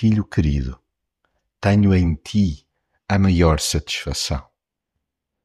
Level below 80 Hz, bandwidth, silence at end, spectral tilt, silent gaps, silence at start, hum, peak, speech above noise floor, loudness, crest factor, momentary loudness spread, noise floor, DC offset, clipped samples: -32 dBFS; 14 kHz; 1.05 s; -5.5 dB/octave; none; 0 s; none; -2 dBFS; 61 dB; -20 LUFS; 18 dB; 12 LU; -79 dBFS; under 0.1%; under 0.1%